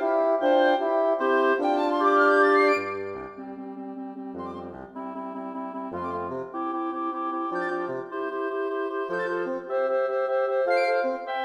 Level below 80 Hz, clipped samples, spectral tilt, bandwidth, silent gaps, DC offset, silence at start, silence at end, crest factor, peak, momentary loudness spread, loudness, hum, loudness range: -68 dBFS; under 0.1%; -5.5 dB/octave; 10 kHz; none; under 0.1%; 0 s; 0 s; 18 dB; -8 dBFS; 16 LU; -25 LUFS; none; 12 LU